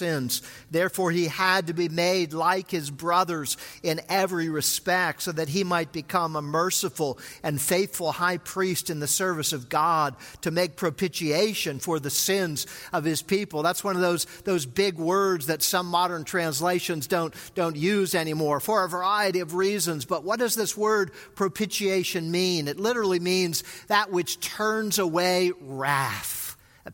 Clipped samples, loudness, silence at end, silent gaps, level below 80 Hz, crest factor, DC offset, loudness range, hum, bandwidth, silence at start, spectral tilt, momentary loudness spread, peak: under 0.1%; -25 LUFS; 0 s; none; -64 dBFS; 20 dB; under 0.1%; 1 LU; none; 17 kHz; 0 s; -3.5 dB/octave; 6 LU; -6 dBFS